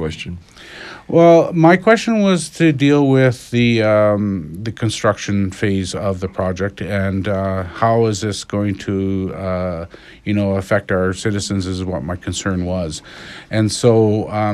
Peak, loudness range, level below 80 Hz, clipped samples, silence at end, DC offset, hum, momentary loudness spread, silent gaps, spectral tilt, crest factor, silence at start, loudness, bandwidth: 0 dBFS; 7 LU; -44 dBFS; under 0.1%; 0 s; under 0.1%; none; 14 LU; none; -6 dB/octave; 16 dB; 0 s; -17 LUFS; 13 kHz